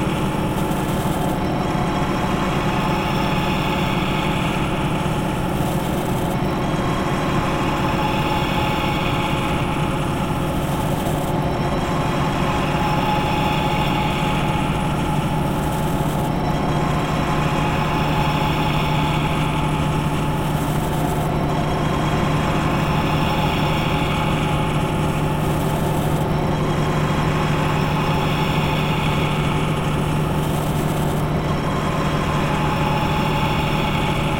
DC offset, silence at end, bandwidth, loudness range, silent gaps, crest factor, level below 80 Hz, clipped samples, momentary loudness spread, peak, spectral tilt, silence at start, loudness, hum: under 0.1%; 0 s; 16.5 kHz; 1 LU; none; 14 dB; -32 dBFS; under 0.1%; 2 LU; -6 dBFS; -6 dB/octave; 0 s; -20 LUFS; none